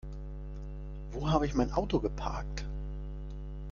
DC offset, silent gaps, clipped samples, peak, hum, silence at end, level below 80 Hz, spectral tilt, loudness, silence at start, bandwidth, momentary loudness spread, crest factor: under 0.1%; none; under 0.1%; -12 dBFS; 50 Hz at -40 dBFS; 0 s; -40 dBFS; -7 dB/octave; -35 LUFS; 0.05 s; 7.2 kHz; 14 LU; 22 dB